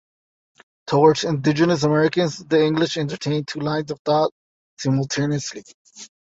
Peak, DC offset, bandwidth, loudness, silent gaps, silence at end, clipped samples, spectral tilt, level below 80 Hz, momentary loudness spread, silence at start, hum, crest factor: -2 dBFS; under 0.1%; 8 kHz; -20 LUFS; 3.99-4.05 s, 4.32-4.77 s, 5.74-5.85 s; 0.15 s; under 0.1%; -5.5 dB/octave; -60 dBFS; 11 LU; 0.85 s; none; 18 dB